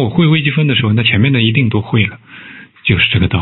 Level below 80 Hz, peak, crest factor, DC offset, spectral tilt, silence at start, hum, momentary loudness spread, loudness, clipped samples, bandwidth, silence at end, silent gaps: -40 dBFS; 0 dBFS; 12 dB; under 0.1%; -10 dB/octave; 0 s; none; 8 LU; -12 LUFS; under 0.1%; 4.2 kHz; 0 s; none